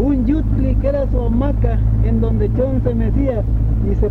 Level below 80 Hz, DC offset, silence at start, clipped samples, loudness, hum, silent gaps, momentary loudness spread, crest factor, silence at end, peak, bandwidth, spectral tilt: -18 dBFS; under 0.1%; 0 s; under 0.1%; -17 LUFS; none; none; 2 LU; 12 dB; 0 s; -4 dBFS; 4 kHz; -11.5 dB/octave